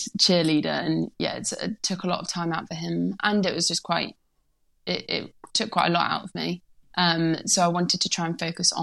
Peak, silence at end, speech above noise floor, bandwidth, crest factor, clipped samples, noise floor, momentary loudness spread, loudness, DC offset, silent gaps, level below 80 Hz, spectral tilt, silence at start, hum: -6 dBFS; 0 s; 42 dB; 12.5 kHz; 20 dB; under 0.1%; -67 dBFS; 9 LU; -25 LUFS; under 0.1%; none; -64 dBFS; -3.5 dB/octave; 0 s; none